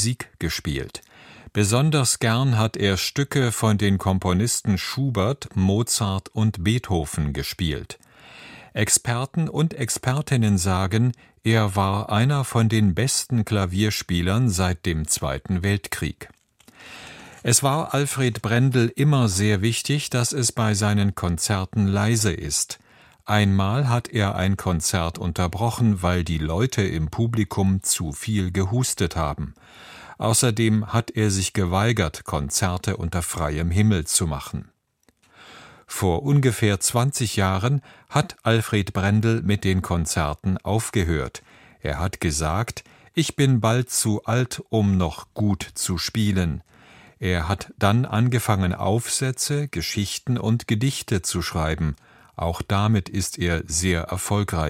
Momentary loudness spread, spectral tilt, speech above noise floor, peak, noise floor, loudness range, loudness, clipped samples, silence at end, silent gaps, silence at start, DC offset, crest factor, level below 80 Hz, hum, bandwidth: 8 LU; -5 dB/octave; 43 dB; -2 dBFS; -65 dBFS; 3 LU; -22 LUFS; under 0.1%; 0 s; none; 0 s; under 0.1%; 20 dB; -40 dBFS; none; 16.5 kHz